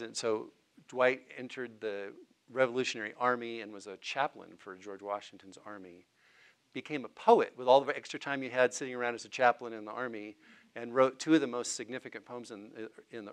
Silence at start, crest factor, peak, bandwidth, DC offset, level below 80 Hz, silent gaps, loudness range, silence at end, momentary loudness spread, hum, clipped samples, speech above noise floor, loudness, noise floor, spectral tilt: 0 s; 24 dB; -10 dBFS; 11.5 kHz; under 0.1%; -90 dBFS; none; 9 LU; 0 s; 21 LU; none; under 0.1%; 31 dB; -32 LUFS; -65 dBFS; -3.5 dB/octave